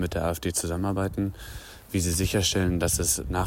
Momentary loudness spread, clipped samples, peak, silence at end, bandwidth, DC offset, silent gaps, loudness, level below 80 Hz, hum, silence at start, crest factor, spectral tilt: 9 LU; under 0.1%; -12 dBFS; 0 s; 17 kHz; under 0.1%; none; -26 LUFS; -38 dBFS; none; 0 s; 16 dB; -4 dB/octave